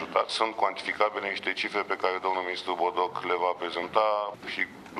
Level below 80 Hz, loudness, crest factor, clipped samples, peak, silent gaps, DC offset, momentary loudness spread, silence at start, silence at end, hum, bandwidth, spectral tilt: -74 dBFS; -28 LUFS; 22 dB; under 0.1%; -6 dBFS; none; under 0.1%; 5 LU; 0 s; 0 s; none; 13 kHz; -3 dB/octave